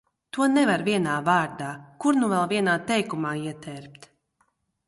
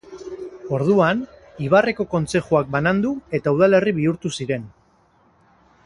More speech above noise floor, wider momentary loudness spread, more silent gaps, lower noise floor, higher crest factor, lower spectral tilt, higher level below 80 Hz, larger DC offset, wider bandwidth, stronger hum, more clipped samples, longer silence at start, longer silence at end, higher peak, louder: first, 46 dB vs 39 dB; about the same, 14 LU vs 16 LU; neither; first, -70 dBFS vs -58 dBFS; about the same, 18 dB vs 18 dB; second, -5 dB/octave vs -6.5 dB/octave; second, -66 dBFS vs -52 dBFS; neither; about the same, 11.5 kHz vs 11.5 kHz; neither; neither; first, 0.35 s vs 0.1 s; second, 0.95 s vs 1.15 s; second, -8 dBFS vs -2 dBFS; second, -24 LUFS vs -20 LUFS